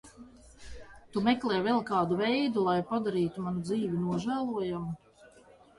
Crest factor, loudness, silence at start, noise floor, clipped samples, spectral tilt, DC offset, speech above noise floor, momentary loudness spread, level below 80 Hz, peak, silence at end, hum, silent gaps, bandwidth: 18 dB; -30 LUFS; 0.05 s; -58 dBFS; under 0.1%; -7 dB/octave; under 0.1%; 28 dB; 15 LU; -60 dBFS; -14 dBFS; 0.5 s; none; none; 11.5 kHz